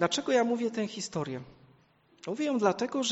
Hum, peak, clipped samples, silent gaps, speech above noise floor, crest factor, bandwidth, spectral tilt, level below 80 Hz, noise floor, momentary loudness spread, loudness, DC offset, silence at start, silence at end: none; -12 dBFS; under 0.1%; none; 34 dB; 20 dB; 8.2 kHz; -4 dB/octave; -70 dBFS; -64 dBFS; 12 LU; -30 LUFS; under 0.1%; 0 s; 0 s